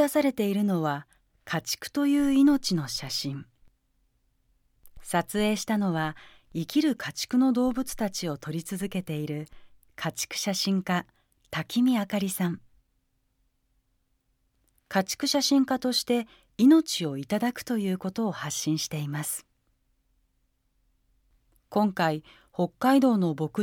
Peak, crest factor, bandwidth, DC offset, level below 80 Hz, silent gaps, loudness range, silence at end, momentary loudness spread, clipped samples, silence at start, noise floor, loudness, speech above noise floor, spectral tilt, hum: -10 dBFS; 18 dB; 17.5 kHz; under 0.1%; -60 dBFS; none; 7 LU; 0 s; 12 LU; under 0.1%; 0 s; -73 dBFS; -27 LUFS; 46 dB; -4.5 dB/octave; none